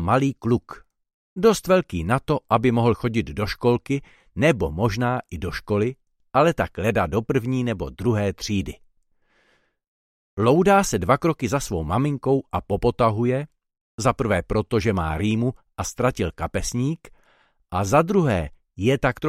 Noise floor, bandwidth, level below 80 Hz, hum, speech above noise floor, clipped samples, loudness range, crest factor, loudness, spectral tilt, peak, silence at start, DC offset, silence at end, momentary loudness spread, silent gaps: -64 dBFS; 15.5 kHz; -42 dBFS; none; 43 dB; under 0.1%; 3 LU; 20 dB; -22 LUFS; -6 dB/octave; -4 dBFS; 0 s; under 0.1%; 0 s; 9 LU; 1.14-1.36 s, 9.88-10.37 s, 13.81-13.98 s